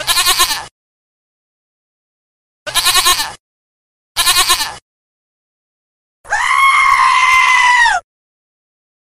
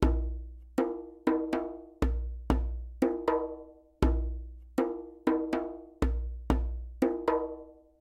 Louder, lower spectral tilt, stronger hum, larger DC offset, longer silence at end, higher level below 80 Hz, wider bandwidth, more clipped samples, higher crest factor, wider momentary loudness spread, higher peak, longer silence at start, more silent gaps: first, -10 LUFS vs -33 LUFS; second, 2 dB/octave vs -8 dB/octave; neither; neither; first, 1.15 s vs 0.3 s; second, -42 dBFS vs -36 dBFS; first, 16 kHz vs 12 kHz; neither; second, 16 dB vs 22 dB; about the same, 12 LU vs 10 LU; first, 0 dBFS vs -10 dBFS; about the same, 0 s vs 0 s; first, 0.71-2.66 s, 3.39-4.15 s, 4.82-6.24 s vs none